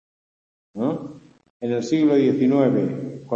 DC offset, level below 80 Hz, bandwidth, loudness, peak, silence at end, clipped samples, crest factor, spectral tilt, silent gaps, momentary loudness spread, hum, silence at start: under 0.1%; -66 dBFS; 7.6 kHz; -21 LUFS; -6 dBFS; 0 s; under 0.1%; 16 dB; -7.5 dB/octave; 1.50-1.60 s; 14 LU; none; 0.75 s